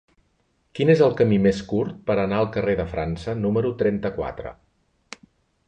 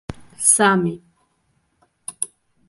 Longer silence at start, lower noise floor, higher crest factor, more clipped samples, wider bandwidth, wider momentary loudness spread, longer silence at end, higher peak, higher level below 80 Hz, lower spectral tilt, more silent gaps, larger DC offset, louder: first, 0.75 s vs 0.1 s; about the same, -67 dBFS vs -66 dBFS; about the same, 18 dB vs 22 dB; neither; second, 8.8 kHz vs 12 kHz; about the same, 21 LU vs 23 LU; first, 1.15 s vs 0.4 s; second, -6 dBFS vs -2 dBFS; first, -46 dBFS vs -52 dBFS; first, -8 dB/octave vs -3 dB/octave; neither; neither; second, -22 LUFS vs -18 LUFS